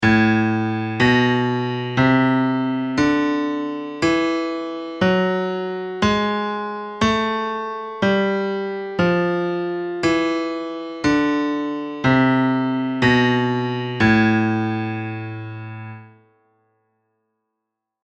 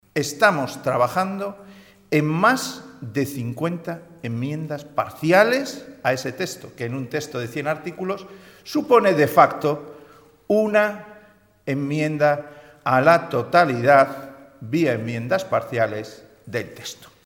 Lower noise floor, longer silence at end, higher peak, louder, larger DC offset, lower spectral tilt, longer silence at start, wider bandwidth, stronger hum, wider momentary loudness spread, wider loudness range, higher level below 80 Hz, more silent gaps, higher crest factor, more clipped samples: first, -81 dBFS vs -53 dBFS; first, 2 s vs 0.2 s; second, -4 dBFS vs 0 dBFS; about the same, -20 LUFS vs -21 LUFS; neither; about the same, -6.5 dB/octave vs -5.5 dB/octave; second, 0 s vs 0.15 s; second, 8.6 kHz vs 18 kHz; neither; second, 11 LU vs 16 LU; about the same, 4 LU vs 5 LU; first, -48 dBFS vs -64 dBFS; neither; second, 16 dB vs 22 dB; neither